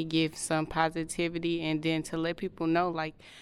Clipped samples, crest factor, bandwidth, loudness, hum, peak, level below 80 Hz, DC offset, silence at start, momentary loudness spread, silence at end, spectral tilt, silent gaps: under 0.1%; 18 dB; 13 kHz; -31 LUFS; none; -12 dBFS; -56 dBFS; under 0.1%; 0 s; 5 LU; 0 s; -5 dB/octave; none